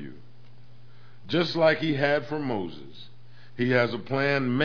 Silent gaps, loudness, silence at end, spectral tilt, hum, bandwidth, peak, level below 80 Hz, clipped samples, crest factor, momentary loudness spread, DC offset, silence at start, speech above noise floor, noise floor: none; -25 LUFS; 0 s; -7 dB/octave; none; 5.4 kHz; -8 dBFS; -68 dBFS; under 0.1%; 20 dB; 16 LU; 0.9%; 0 s; 28 dB; -53 dBFS